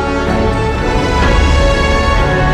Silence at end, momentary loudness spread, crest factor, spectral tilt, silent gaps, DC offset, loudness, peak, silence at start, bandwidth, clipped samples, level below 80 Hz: 0 s; 3 LU; 10 dB; -6 dB/octave; none; under 0.1%; -13 LUFS; 0 dBFS; 0 s; 11 kHz; under 0.1%; -16 dBFS